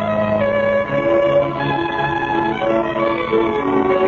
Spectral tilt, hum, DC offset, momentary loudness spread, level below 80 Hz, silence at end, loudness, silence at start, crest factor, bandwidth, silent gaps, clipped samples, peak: -7.5 dB/octave; none; under 0.1%; 4 LU; -44 dBFS; 0 s; -17 LUFS; 0 s; 12 dB; 7 kHz; none; under 0.1%; -4 dBFS